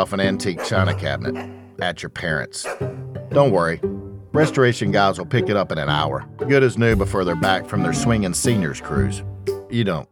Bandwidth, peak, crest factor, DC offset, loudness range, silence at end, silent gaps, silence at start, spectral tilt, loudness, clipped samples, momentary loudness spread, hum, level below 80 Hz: 18 kHz; -2 dBFS; 18 dB; under 0.1%; 4 LU; 0.1 s; none; 0 s; -5.5 dB/octave; -20 LUFS; under 0.1%; 11 LU; none; -40 dBFS